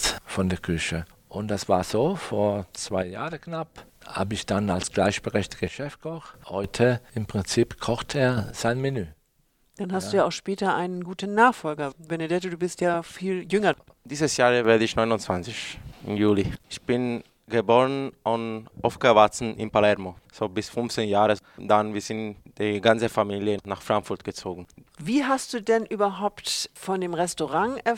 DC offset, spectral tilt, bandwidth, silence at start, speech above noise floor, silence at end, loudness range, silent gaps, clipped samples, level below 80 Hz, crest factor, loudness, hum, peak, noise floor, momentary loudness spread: under 0.1%; -5 dB/octave; 17 kHz; 0 s; 41 dB; 0 s; 4 LU; none; under 0.1%; -52 dBFS; 22 dB; -25 LUFS; none; -2 dBFS; -66 dBFS; 13 LU